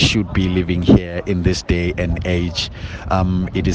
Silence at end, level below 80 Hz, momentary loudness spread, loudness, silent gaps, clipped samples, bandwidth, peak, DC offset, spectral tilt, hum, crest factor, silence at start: 0 s; -30 dBFS; 8 LU; -18 LUFS; none; under 0.1%; 9.4 kHz; 0 dBFS; under 0.1%; -6 dB/octave; none; 16 dB; 0 s